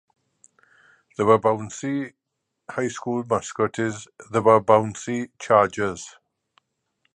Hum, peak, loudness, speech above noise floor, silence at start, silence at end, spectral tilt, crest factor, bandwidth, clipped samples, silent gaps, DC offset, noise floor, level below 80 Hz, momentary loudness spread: none; -2 dBFS; -22 LUFS; 58 dB; 1.2 s; 1.05 s; -5.5 dB/octave; 22 dB; 10 kHz; under 0.1%; none; under 0.1%; -80 dBFS; -60 dBFS; 16 LU